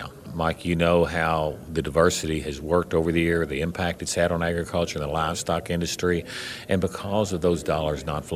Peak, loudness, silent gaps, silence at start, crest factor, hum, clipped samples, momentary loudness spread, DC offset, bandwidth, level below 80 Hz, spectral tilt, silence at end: -6 dBFS; -25 LUFS; none; 0 s; 20 dB; none; under 0.1%; 7 LU; under 0.1%; 15.5 kHz; -42 dBFS; -5 dB/octave; 0 s